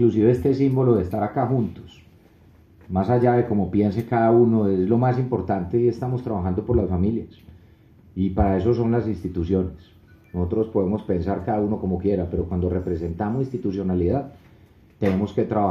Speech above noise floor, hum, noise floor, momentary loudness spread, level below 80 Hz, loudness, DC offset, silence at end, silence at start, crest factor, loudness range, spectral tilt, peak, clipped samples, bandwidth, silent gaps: 31 dB; none; -52 dBFS; 9 LU; -44 dBFS; -22 LUFS; under 0.1%; 0 s; 0 s; 18 dB; 5 LU; -10.5 dB/octave; -4 dBFS; under 0.1%; 7 kHz; none